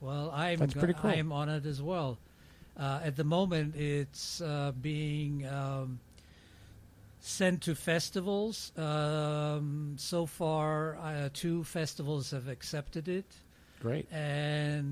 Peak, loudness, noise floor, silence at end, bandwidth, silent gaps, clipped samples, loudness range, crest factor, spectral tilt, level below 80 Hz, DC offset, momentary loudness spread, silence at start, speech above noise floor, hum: -16 dBFS; -34 LUFS; -57 dBFS; 0 s; 15.5 kHz; none; under 0.1%; 4 LU; 18 dB; -5.5 dB/octave; -58 dBFS; under 0.1%; 9 LU; 0 s; 24 dB; none